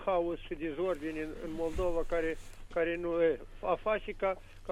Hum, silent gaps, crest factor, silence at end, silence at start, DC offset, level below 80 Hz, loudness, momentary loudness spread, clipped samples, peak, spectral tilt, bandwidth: none; none; 16 dB; 0 s; 0 s; under 0.1%; -46 dBFS; -34 LUFS; 8 LU; under 0.1%; -16 dBFS; -6.5 dB/octave; 13.5 kHz